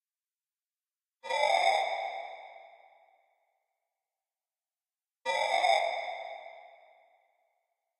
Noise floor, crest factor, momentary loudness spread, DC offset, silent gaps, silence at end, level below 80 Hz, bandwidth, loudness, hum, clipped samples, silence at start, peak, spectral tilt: under -90 dBFS; 24 dB; 22 LU; under 0.1%; none; 1.35 s; -84 dBFS; 13 kHz; -30 LUFS; none; under 0.1%; 1.25 s; -12 dBFS; 1 dB/octave